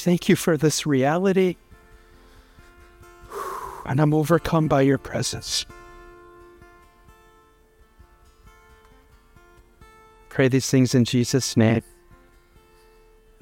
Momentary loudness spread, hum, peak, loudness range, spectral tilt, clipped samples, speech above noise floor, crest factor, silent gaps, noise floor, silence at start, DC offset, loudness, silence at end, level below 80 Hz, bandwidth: 13 LU; none; -4 dBFS; 8 LU; -5.5 dB/octave; under 0.1%; 36 dB; 20 dB; none; -56 dBFS; 0 s; under 0.1%; -21 LUFS; 1.6 s; -50 dBFS; 17 kHz